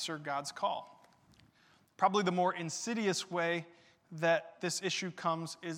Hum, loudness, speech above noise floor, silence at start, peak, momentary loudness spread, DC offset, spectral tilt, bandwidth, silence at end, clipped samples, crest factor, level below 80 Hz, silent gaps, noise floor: none; -34 LUFS; 33 dB; 0 s; -16 dBFS; 8 LU; under 0.1%; -3.5 dB/octave; 16.5 kHz; 0 s; under 0.1%; 20 dB; -86 dBFS; none; -67 dBFS